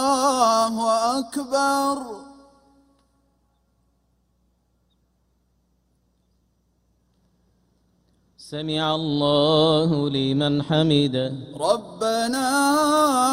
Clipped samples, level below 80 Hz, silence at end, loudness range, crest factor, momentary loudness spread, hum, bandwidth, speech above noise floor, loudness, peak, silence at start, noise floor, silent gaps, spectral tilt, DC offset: under 0.1%; -60 dBFS; 0 s; 11 LU; 18 dB; 9 LU; none; 16 kHz; 46 dB; -21 LUFS; -6 dBFS; 0 s; -67 dBFS; none; -4.5 dB/octave; under 0.1%